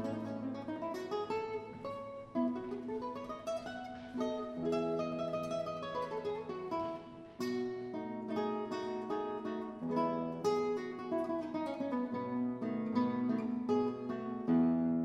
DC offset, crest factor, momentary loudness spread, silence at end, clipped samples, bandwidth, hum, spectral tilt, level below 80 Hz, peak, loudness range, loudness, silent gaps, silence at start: under 0.1%; 16 dB; 8 LU; 0 s; under 0.1%; 11.5 kHz; none; -7 dB/octave; -70 dBFS; -20 dBFS; 4 LU; -38 LUFS; none; 0 s